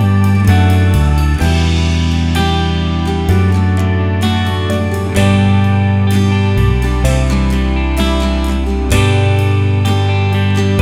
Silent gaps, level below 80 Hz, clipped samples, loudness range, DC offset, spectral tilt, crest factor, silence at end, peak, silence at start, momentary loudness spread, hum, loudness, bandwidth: none; -20 dBFS; under 0.1%; 1 LU; under 0.1%; -6.5 dB/octave; 12 dB; 0 s; 0 dBFS; 0 s; 4 LU; none; -13 LUFS; 14 kHz